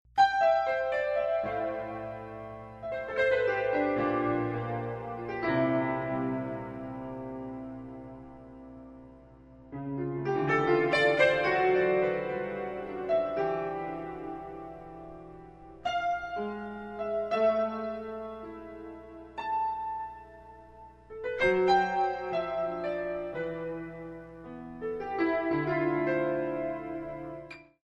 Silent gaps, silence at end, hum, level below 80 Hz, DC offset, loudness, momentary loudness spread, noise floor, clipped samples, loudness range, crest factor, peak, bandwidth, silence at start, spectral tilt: none; 0.2 s; 60 Hz at -60 dBFS; -60 dBFS; under 0.1%; -30 LUFS; 20 LU; -53 dBFS; under 0.1%; 10 LU; 20 dB; -12 dBFS; 9.4 kHz; 0.15 s; -7 dB/octave